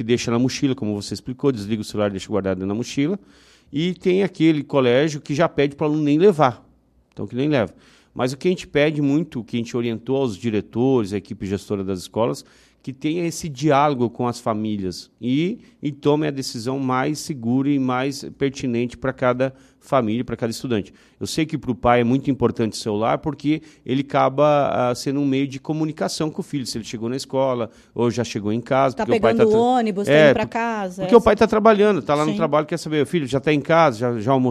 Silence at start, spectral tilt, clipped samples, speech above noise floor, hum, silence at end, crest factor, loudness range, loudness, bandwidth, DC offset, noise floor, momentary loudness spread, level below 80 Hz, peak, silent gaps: 0 s; -6 dB/octave; under 0.1%; 37 dB; none; 0 s; 20 dB; 7 LU; -21 LUFS; 13.5 kHz; under 0.1%; -58 dBFS; 11 LU; -50 dBFS; 0 dBFS; none